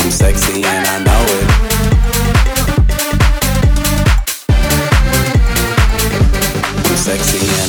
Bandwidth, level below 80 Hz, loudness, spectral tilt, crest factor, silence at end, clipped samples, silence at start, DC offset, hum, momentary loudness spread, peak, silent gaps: over 20 kHz; -14 dBFS; -13 LUFS; -4 dB/octave; 10 dB; 0 s; under 0.1%; 0 s; under 0.1%; none; 2 LU; 0 dBFS; none